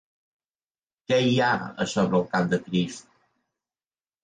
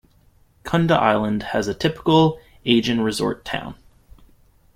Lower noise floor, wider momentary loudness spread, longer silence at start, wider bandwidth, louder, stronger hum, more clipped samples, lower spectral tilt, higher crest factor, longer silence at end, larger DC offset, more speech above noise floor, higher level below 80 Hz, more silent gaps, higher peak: first, under -90 dBFS vs -56 dBFS; second, 6 LU vs 12 LU; first, 1.1 s vs 0.65 s; second, 9.6 kHz vs 15.5 kHz; second, -24 LUFS vs -20 LUFS; neither; neither; about the same, -5.5 dB/octave vs -6 dB/octave; about the same, 18 dB vs 18 dB; first, 1.25 s vs 1 s; neither; first, over 66 dB vs 37 dB; second, -62 dBFS vs -50 dBFS; neither; second, -10 dBFS vs -2 dBFS